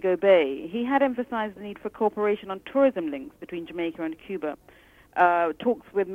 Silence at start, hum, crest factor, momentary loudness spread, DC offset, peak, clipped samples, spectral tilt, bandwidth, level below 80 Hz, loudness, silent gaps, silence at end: 0 s; none; 20 dB; 15 LU; under 0.1%; -6 dBFS; under 0.1%; -7 dB/octave; 4.4 kHz; -64 dBFS; -25 LUFS; none; 0 s